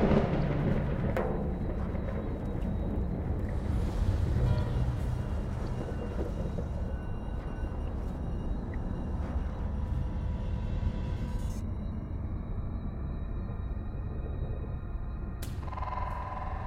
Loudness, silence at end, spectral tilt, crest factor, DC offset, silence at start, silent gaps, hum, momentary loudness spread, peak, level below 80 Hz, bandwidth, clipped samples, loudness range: -35 LUFS; 0 s; -8.5 dB/octave; 20 dB; under 0.1%; 0 s; none; none; 8 LU; -12 dBFS; -36 dBFS; 12.5 kHz; under 0.1%; 5 LU